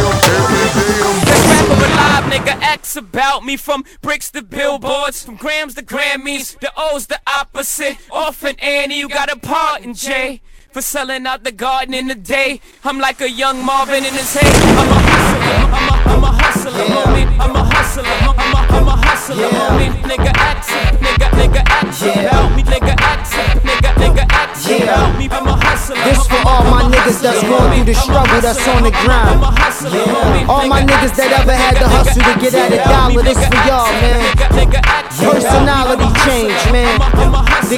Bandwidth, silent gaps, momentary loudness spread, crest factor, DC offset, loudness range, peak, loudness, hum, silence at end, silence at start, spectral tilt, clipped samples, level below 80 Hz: 17.5 kHz; none; 9 LU; 12 dB; under 0.1%; 7 LU; 0 dBFS; -12 LUFS; none; 0 s; 0 s; -4.5 dB/octave; under 0.1%; -16 dBFS